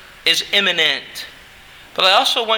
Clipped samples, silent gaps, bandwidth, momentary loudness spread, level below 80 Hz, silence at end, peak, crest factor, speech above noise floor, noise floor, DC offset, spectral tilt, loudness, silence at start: under 0.1%; none; over 20 kHz; 18 LU; -56 dBFS; 0 s; 0 dBFS; 18 dB; 26 dB; -42 dBFS; under 0.1%; -0.5 dB/octave; -15 LUFS; 0.25 s